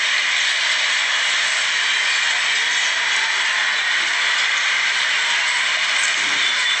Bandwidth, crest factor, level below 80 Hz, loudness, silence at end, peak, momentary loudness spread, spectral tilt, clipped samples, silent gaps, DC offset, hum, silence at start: 10 kHz; 14 dB; -86 dBFS; -16 LUFS; 0 s; -6 dBFS; 1 LU; 3 dB/octave; under 0.1%; none; under 0.1%; none; 0 s